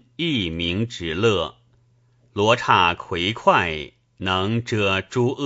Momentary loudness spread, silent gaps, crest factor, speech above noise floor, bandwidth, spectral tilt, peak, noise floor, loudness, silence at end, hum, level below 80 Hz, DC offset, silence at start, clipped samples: 11 LU; none; 22 dB; 38 dB; 8 kHz; -5 dB/octave; 0 dBFS; -59 dBFS; -21 LUFS; 0 s; none; -48 dBFS; under 0.1%; 0.2 s; under 0.1%